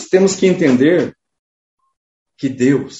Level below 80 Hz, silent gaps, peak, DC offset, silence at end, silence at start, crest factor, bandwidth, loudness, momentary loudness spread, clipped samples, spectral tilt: -56 dBFS; 1.39-1.77 s, 1.97-2.26 s; 0 dBFS; under 0.1%; 0 s; 0 s; 16 dB; 8 kHz; -14 LUFS; 12 LU; under 0.1%; -5.5 dB/octave